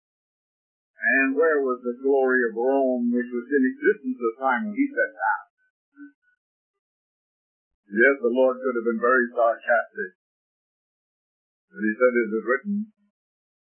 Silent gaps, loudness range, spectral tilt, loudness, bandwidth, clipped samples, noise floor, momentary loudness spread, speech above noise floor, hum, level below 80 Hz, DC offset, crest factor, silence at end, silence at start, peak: 5.50-5.57 s, 5.70-5.92 s, 6.15-6.22 s, 6.38-7.83 s, 10.15-11.68 s; 5 LU; -10.5 dB/octave; -23 LUFS; 3.3 kHz; under 0.1%; under -90 dBFS; 9 LU; over 67 dB; none; -86 dBFS; under 0.1%; 20 dB; 0.85 s; 1 s; -6 dBFS